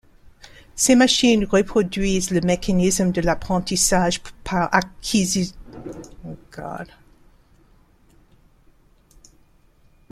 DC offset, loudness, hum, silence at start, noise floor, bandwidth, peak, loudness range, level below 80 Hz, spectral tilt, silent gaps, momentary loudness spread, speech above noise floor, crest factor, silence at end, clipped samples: under 0.1%; -19 LUFS; none; 0.75 s; -55 dBFS; 15 kHz; -2 dBFS; 22 LU; -40 dBFS; -4 dB/octave; none; 22 LU; 36 dB; 20 dB; 3.25 s; under 0.1%